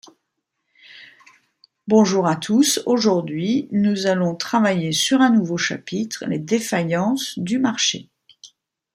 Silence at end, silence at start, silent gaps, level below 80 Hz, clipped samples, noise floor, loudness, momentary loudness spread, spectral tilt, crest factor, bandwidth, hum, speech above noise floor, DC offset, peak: 0.5 s; 0.95 s; none; -66 dBFS; under 0.1%; -77 dBFS; -19 LUFS; 9 LU; -4.5 dB/octave; 18 dB; 16 kHz; none; 58 dB; under 0.1%; -2 dBFS